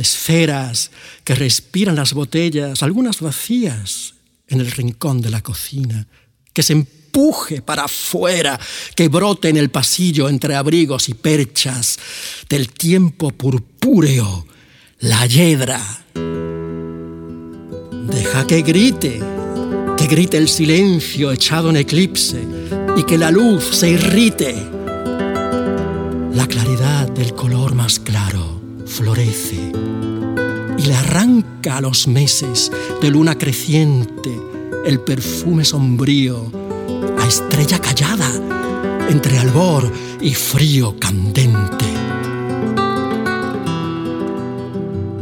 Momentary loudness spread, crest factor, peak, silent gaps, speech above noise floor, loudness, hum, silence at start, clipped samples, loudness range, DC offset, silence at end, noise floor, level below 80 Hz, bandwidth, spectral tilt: 11 LU; 14 dB; -2 dBFS; none; 32 dB; -16 LUFS; none; 0 s; under 0.1%; 4 LU; under 0.1%; 0 s; -47 dBFS; -42 dBFS; 18 kHz; -4.5 dB/octave